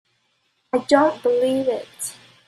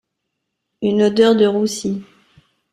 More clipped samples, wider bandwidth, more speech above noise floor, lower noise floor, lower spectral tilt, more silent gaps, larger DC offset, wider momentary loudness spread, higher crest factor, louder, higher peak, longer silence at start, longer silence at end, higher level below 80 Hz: neither; about the same, 14 kHz vs 14 kHz; second, 48 dB vs 61 dB; second, -68 dBFS vs -76 dBFS; second, -3.5 dB/octave vs -5.5 dB/octave; neither; neither; about the same, 14 LU vs 12 LU; about the same, 20 dB vs 16 dB; second, -21 LUFS vs -16 LUFS; about the same, -2 dBFS vs -2 dBFS; about the same, 0.75 s vs 0.8 s; second, 0.35 s vs 0.7 s; second, -68 dBFS vs -60 dBFS